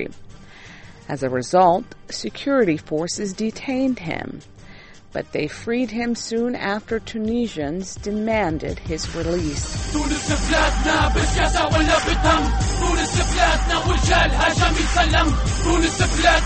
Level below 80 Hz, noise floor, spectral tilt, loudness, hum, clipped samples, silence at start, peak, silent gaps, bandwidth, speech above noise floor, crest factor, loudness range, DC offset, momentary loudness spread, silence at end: -26 dBFS; -42 dBFS; -4.5 dB/octave; -20 LUFS; none; under 0.1%; 0 s; -4 dBFS; none; 8.8 kHz; 22 dB; 18 dB; 7 LU; under 0.1%; 10 LU; 0 s